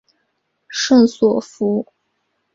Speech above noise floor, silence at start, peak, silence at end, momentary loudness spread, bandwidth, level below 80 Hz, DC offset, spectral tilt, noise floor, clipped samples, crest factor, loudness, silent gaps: 55 dB; 0.7 s; -2 dBFS; 0.7 s; 13 LU; 7.8 kHz; -60 dBFS; under 0.1%; -4.5 dB/octave; -70 dBFS; under 0.1%; 16 dB; -17 LUFS; none